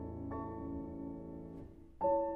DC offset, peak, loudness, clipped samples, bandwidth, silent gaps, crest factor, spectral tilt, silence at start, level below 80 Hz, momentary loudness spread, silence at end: under 0.1%; -22 dBFS; -41 LUFS; under 0.1%; 2.9 kHz; none; 18 dB; -11.5 dB/octave; 0 s; -56 dBFS; 16 LU; 0 s